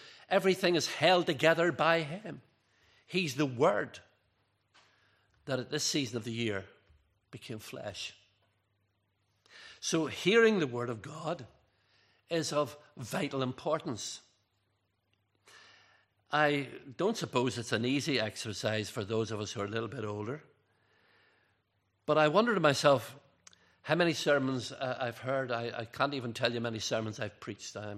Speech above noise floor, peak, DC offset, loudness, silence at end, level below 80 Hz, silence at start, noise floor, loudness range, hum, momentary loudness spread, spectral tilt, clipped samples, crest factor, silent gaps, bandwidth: 46 dB; -8 dBFS; under 0.1%; -32 LUFS; 0 s; -76 dBFS; 0 s; -78 dBFS; 9 LU; none; 16 LU; -4.5 dB/octave; under 0.1%; 24 dB; none; 14.5 kHz